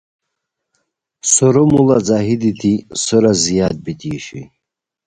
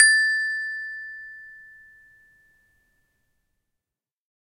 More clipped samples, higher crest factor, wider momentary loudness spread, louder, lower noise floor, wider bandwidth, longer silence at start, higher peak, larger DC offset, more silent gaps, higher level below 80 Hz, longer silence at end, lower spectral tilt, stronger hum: neither; second, 16 dB vs 26 dB; second, 14 LU vs 25 LU; first, -14 LUFS vs -22 LUFS; second, -79 dBFS vs -90 dBFS; second, 11 kHz vs 13.5 kHz; first, 1.25 s vs 0 s; about the same, 0 dBFS vs -2 dBFS; neither; neither; first, -46 dBFS vs -68 dBFS; second, 0.6 s vs 2.85 s; first, -5 dB/octave vs 5.5 dB/octave; neither